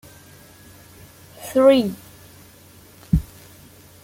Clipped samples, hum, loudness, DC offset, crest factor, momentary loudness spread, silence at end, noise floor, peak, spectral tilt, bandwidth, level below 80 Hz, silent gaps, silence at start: under 0.1%; none; -19 LUFS; under 0.1%; 20 dB; 24 LU; 0.8 s; -48 dBFS; -4 dBFS; -6.5 dB/octave; 17 kHz; -38 dBFS; none; 1.4 s